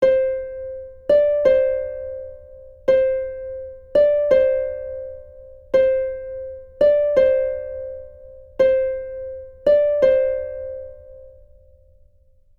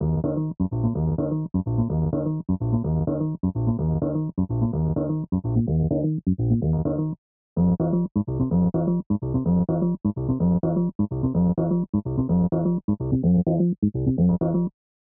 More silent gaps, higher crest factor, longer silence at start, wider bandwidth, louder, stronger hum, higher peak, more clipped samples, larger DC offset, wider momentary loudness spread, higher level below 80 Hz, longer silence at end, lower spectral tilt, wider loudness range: second, none vs 7.18-7.56 s, 8.11-8.15 s, 9.06-9.10 s, 10.95-10.99 s, 11.89-11.93 s, 12.84-12.88 s, 13.78-13.82 s; about the same, 16 dB vs 14 dB; about the same, 0 s vs 0 s; first, 6.8 kHz vs 1.6 kHz; first, -19 LUFS vs -24 LUFS; neither; first, -4 dBFS vs -10 dBFS; neither; neither; first, 18 LU vs 5 LU; second, -48 dBFS vs -40 dBFS; first, 1.3 s vs 0.4 s; second, -6.5 dB/octave vs -13.5 dB/octave; about the same, 1 LU vs 2 LU